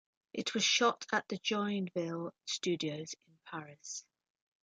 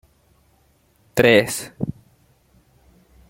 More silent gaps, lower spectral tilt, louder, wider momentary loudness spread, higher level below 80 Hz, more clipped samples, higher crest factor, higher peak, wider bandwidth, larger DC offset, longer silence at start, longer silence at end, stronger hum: neither; second, -3 dB/octave vs -4.5 dB/octave; second, -34 LUFS vs -19 LUFS; about the same, 17 LU vs 16 LU; second, -82 dBFS vs -52 dBFS; neither; about the same, 20 dB vs 22 dB; second, -16 dBFS vs -2 dBFS; second, 9.6 kHz vs 16.5 kHz; neither; second, 0.35 s vs 1.15 s; second, 0.6 s vs 1.4 s; neither